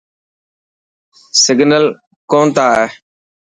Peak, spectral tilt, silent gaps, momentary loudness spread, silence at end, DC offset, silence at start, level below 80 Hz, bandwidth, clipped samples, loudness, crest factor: 0 dBFS; -3 dB/octave; 2.07-2.28 s; 7 LU; 0.65 s; under 0.1%; 1.35 s; -58 dBFS; 11 kHz; under 0.1%; -12 LUFS; 14 dB